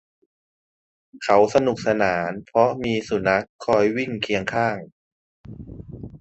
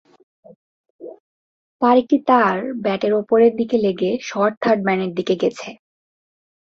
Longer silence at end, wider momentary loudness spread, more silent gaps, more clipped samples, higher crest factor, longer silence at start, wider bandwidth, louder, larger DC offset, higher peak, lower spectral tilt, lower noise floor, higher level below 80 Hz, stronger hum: second, 0.05 s vs 1 s; first, 20 LU vs 15 LU; about the same, 3.49-3.59 s, 4.92-5.44 s vs 1.20-1.79 s, 4.57-4.61 s; neither; about the same, 20 dB vs 18 dB; first, 1.15 s vs 1 s; first, 8.4 kHz vs 7.6 kHz; second, -21 LUFS vs -18 LUFS; neither; about the same, -2 dBFS vs -2 dBFS; about the same, -5.5 dB/octave vs -6.5 dB/octave; about the same, under -90 dBFS vs under -90 dBFS; first, -52 dBFS vs -64 dBFS; neither